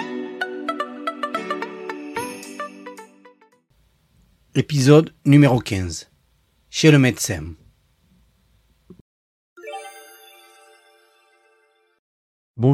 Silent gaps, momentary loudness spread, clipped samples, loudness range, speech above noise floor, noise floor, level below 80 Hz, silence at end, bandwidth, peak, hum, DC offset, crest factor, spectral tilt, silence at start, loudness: 9.01-9.56 s, 11.99-12.54 s; 23 LU; under 0.1%; 14 LU; 46 dB; -62 dBFS; -56 dBFS; 0 s; 15 kHz; -2 dBFS; none; under 0.1%; 20 dB; -6 dB/octave; 0 s; -20 LUFS